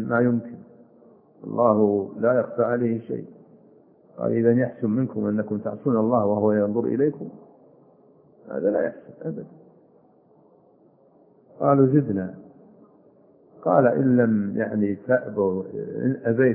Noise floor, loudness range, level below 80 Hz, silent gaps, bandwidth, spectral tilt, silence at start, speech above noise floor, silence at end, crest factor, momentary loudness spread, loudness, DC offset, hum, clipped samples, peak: -57 dBFS; 9 LU; -70 dBFS; none; 2.8 kHz; -14 dB/octave; 0 s; 35 dB; 0 s; 20 dB; 15 LU; -23 LUFS; under 0.1%; none; under 0.1%; -4 dBFS